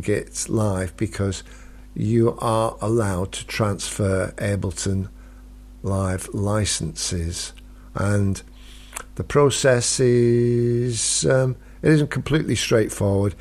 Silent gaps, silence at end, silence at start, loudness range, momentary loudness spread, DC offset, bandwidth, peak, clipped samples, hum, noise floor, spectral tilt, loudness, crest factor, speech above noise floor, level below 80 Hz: none; 0 s; 0 s; 6 LU; 10 LU; under 0.1%; 14 kHz; -6 dBFS; under 0.1%; none; -42 dBFS; -5 dB/octave; -22 LUFS; 16 dB; 21 dB; -42 dBFS